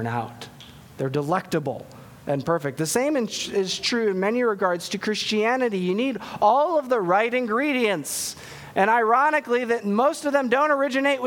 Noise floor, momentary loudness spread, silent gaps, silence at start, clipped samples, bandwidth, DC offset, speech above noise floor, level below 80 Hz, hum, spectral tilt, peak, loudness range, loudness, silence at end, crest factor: -45 dBFS; 10 LU; none; 0 s; under 0.1%; 19 kHz; under 0.1%; 22 dB; -64 dBFS; none; -4 dB/octave; -6 dBFS; 4 LU; -23 LUFS; 0 s; 18 dB